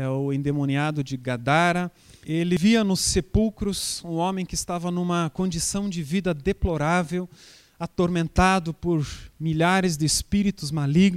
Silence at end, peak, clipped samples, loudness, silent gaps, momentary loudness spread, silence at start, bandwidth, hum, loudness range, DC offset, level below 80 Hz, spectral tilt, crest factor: 0 s; -4 dBFS; under 0.1%; -24 LUFS; none; 9 LU; 0 s; 15.5 kHz; none; 3 LU; under 0.1%; -40 dBFS; -5 dB/octave; 20 dB